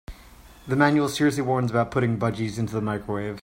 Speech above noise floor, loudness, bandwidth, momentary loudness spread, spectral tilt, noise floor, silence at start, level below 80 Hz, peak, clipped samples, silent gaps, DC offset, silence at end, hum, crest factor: 25 dB; -24 LUFS; 16 kHz; 8 LU; -6.5 dB/octave; -48 dBFS; 0.1 s; -50 dBFS; -6 dBFS; under 0.1%; none; under 0.1%; 0 s; none; 18 dB